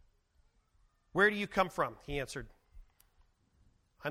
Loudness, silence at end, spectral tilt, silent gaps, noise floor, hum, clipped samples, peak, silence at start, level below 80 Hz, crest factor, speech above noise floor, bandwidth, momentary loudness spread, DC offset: -33 LUFS; 0 s; -5 dB/octave; none; -71 dBFS; none; under 0.1%; -14 dBFS; 1.15 s; -58 dBFS; 24 dB; 38 dB; 16 kHz; 14 LU; under 0.1%